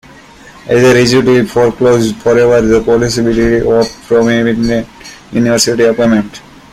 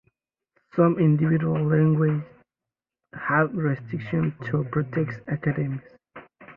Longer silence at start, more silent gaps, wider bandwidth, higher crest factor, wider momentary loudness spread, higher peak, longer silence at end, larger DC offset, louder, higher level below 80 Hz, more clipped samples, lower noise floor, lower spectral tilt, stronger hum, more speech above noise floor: second, 0.45 s vs 0.75 s; neither; first, 15.5 kHz vs 3.9 kHz; second, 10 dB vs 18 dB; second, 7 LU vs 11 LU; first, 0 dBFS vs -8 dBFS; first, 0.35 s vs 0.05 s; neither; first, -10 LUFS vs -24 LUFS; first, -34 dBFS vs -60 dBFS; neither; second, -36 dBFS vs -89 dBFS; second, -5 dB/octave vs -11.5 dB/octave; neither; second, 27 dB vs 66 dB